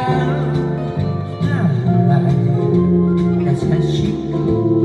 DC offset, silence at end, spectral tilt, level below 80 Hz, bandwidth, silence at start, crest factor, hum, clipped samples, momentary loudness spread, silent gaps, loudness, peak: under 0.1%; 0 s; -9 dB/octave; -40 dBFS; 8 kHz; 0 s; 14 dB; none; under 0.1%; 6 LU; none; -17 LUFS; -2 dBFS